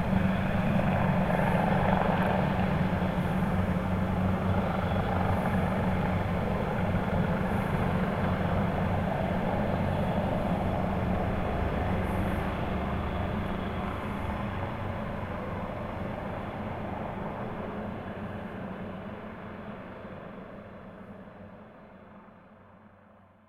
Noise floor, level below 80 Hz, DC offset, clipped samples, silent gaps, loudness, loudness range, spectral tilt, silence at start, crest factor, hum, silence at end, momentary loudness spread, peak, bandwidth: -57 dBFS; -40 dBFS; under 0.1%; under 0.1%; none; -30 LUFS; 14 LU; -8.5 dB/octave; 0 s; 18 dB; none; 0.6 s; 16 LU; -12 dBFS; 14.5 kHz